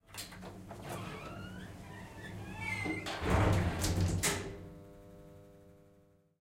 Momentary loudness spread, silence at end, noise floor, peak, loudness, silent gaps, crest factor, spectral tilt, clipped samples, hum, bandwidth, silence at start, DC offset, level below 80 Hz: 23 LU; 0.65 s; -66 dBFS; -16 dBFS; -36 LUFS; none; 20 dB; -4.5 dB/octave; under 0.1%; none; 16 kHz; 0.1 s; under 0.1%; -46 dBFS